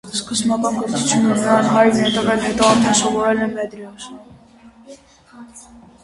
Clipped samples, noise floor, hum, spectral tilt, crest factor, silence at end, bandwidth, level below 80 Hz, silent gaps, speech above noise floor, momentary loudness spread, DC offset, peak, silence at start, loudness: under 0.1%; -46 dBFS; none; -3.5 dB/octave; 18 dB; 0.4 s; 11.5 kHz; -50 dBFS; none; 29 dB; 15 LU; under 0.1%; 0 dBFS; 0.05 s; -16 LUFS